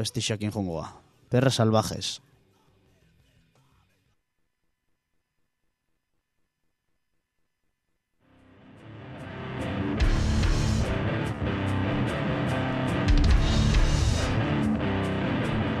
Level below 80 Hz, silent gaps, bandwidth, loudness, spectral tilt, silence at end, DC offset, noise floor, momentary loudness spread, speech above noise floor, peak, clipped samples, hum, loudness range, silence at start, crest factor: -32 dBFS; none; 13 kHz; -27 LUFS; -5.5 dB/octave; 0 s; under 0.1%; -76 dBFS; 13 LU; 49 dB; -8 dBFS; under 0.1%; none; 13 LU; 0 s; 20 dB